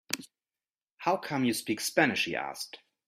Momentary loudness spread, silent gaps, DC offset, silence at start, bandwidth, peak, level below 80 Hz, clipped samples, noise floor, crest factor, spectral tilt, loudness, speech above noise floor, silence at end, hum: 11 LU; 0.91-0.97 s; under 0.1%; 0.1 s; 16 kHz; -8 dBFS; -74 dBFS; under 0.1%; under -90 dBFS; 24 dB; -3.5 dB/octave; -30 LUFS; over 60 dB; 0.3 s; none